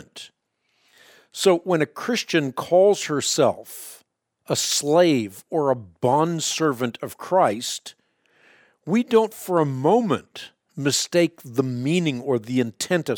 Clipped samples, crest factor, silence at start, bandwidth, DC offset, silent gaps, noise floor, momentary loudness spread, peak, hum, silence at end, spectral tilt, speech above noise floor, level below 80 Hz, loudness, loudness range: under 0.1%; 18 dB; 0.15 s; 20 kHz; under 0.1%; none; -71 dBFS; 16 LU; -4 dBFS; none; 0 s; -4.5 dB/octave; 49 dB; -70 dBFS; -22 LUFS; 3 LU